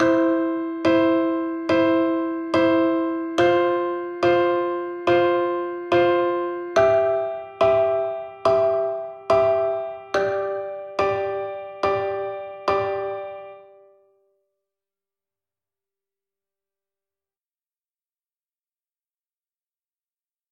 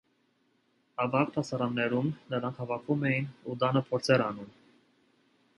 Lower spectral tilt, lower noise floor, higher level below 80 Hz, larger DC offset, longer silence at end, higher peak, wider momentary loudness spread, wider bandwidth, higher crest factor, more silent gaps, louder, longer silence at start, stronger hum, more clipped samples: about the same, -6.5 dB/octave vs -6.5 dB/octave; first, under -90 dBFS vs -72 dBFS; first, -58 dBFS vs -72 dBFS; neither; first, 6.9 s vs 1.1 s; first, -6 dBFS vs -12 dBFS; about the same, 10 LU vs 10 LU; second, 7.4 kHz vs 11.5 kHz; about the same, 18 dB vs 20 dB; neither; first, -22 LUFS vs -30 LUFS; second, 0 s vs 1 s; second, none vs 60 Hz at -50 dBFS; neither